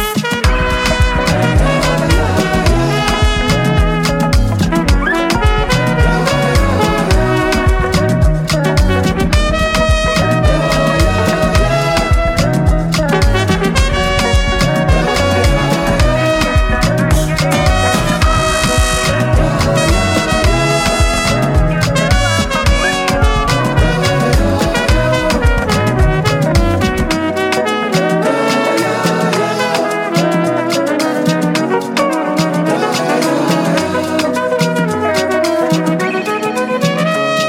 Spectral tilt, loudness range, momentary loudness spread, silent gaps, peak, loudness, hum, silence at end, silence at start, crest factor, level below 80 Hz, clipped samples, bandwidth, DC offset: -5 dB/octave; 2 LU; 2 LU; none; -2 dBFS; -13 LUFS; none; 0 s; 0 s; 10 dB; -18 dBFS; under 0.1%; 16.5 kHz; under 0.1%